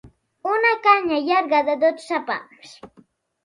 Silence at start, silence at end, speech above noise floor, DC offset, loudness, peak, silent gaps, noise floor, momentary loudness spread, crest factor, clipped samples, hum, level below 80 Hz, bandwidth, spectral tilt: 0.05 s; 0.6 s; 35 dB; under 0.1%; -20 LUFS; -2 dBFS; none; -56 dBFS; 12 LU; 20 dB; under 0.1%; none; -64 dBFS; 11.5 kHz; -4 dB/octave